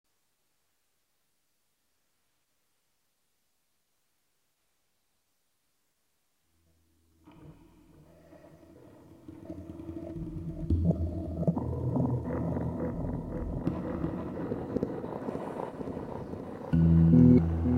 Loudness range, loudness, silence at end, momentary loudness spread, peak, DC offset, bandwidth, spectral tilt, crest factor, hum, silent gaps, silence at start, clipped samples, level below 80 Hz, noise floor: 18 LU; -30 LUFS; 0 s; 19 LU; -10 dBFS; under 0.1%; 4.3 kHz; -11 dB/octave; 22 dB; none; none; 7.25 s; under 0.1%; -48 dBFS; -78 dBFS